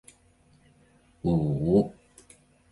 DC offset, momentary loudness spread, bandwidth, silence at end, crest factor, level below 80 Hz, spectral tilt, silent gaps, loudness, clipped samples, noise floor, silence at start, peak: under 0.1%; 9 LU; 11.5 kHz; 0.8 s; 20 dB; -50 dBFS; -9.5 dB/octave; none; -26 LUFS; under 0.1%; -61 dBFS; 1.25 s; -10 dBFS